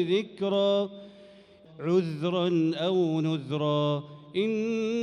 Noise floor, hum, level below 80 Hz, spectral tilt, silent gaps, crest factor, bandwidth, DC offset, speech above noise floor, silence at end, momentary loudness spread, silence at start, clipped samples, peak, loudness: -53 dBFS; none; -74 dBFS; -7 dB/octave; none; 14 dB; 10.5 kHz; under 0.1%; 26 dB; 0 s; 8 LU; 0 s; under 0.1%; -14 dBFS; -28 LUFS